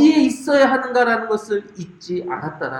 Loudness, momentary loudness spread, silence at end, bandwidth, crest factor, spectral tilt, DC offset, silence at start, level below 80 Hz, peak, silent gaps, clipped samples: -19 LUFS; 12 LU; 0 s; 12 kHz; 16 dB; -5 dB/octave; under 0.1%; 0 s; -62 dBFS; -2 dBFS; none; under 0.1%